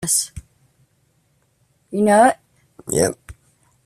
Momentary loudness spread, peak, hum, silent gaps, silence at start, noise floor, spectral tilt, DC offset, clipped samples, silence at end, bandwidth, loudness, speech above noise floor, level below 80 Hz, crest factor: 24 LU; -2 dBFS; none; none; 0 s; -63 dBFS; -3.5 dB/octave; under 0.1%; under 0.1%; 0.55 s; 15 kHz; -18 LUFS; 47 dB; -50 dBFS; 20 dB